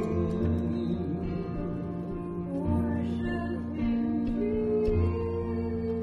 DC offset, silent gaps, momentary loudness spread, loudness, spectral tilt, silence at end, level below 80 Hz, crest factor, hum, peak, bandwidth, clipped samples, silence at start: under 0.1%; none; 7 LU; -30 LUFS; -10 dB/octave; 0 s; -42 dBFS; 14 dB; none; -14 dBFS; 5.8 kHz; under 0.1%; 0 s